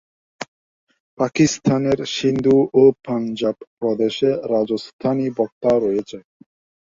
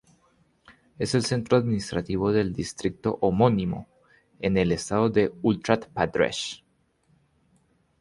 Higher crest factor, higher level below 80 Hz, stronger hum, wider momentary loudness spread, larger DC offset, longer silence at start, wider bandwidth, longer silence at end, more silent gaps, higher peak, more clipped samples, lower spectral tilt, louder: about the same, 18 dB vs 22 dB; second, -56 dBFS vs -50 dBFS; neither; first, 14 LU vs 9 LU; neither; second, 0.4 s vs 0.7 s; second, 7.6 kHz vs 11.5 kHz; second, 0.65 s vs 1.45 s; first, 0.48-0.87 s, 1.00-1.17 s, 3.67-3.77 s, 4.93-4.99 s, 5.52-5.61 s vs none; about the same, -2 dBFS vs -4 dBFS; neither; about the same, -5.5 dB/octave vs -6 dB/octave; first, -19 LUFS vs -25 LUFS